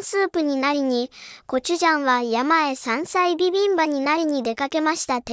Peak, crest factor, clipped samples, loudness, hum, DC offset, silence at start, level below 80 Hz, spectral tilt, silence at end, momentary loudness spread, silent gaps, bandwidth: -6 dBFS; 14 dB; under 0.1%; -21 LUFS; none; under 0.1%; 0 s; -62 dBFS; -2.5 dB/octave; 0 s; 6 LU; none; 8 kHz